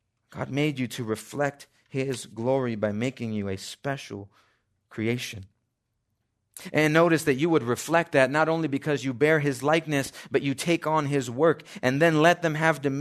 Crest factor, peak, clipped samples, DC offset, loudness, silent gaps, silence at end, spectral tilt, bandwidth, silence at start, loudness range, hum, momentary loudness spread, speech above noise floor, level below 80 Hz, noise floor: 22 dB; -4 dBFS; under 0.1%; under 0.1%; -25 LUFS; none; 0 s; -5.5 dB/octave; 13.5 kHz; 0.35 s; 9 LU; none; 12 LU; 53 dB; -68 dBFS; -78 dBFS